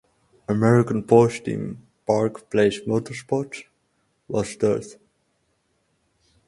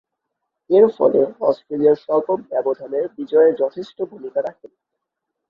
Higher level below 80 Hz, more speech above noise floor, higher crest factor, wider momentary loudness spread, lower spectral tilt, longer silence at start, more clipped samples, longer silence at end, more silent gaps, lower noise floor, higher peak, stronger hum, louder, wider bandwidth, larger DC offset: first, -58 dBFS vs -66 dBFS; second, 48 dB vs 61 dB; about the same, 22 dB vs 18 dB; first, 17 LU vs 11 LU; second, -7 dB/octave vs -8.5 dB/octave; second, 0.5 s vs 0.7 s; neither; first, 1.55 s vs 1 s; neither; second, -69 dBFS vs -80 dBFS; about the same, -2 dBFS vs -2 dBFS; neither; second, -22 LUFS vs -19 LUFS; first, 11.5 kHz vs 5.4 kHz; neither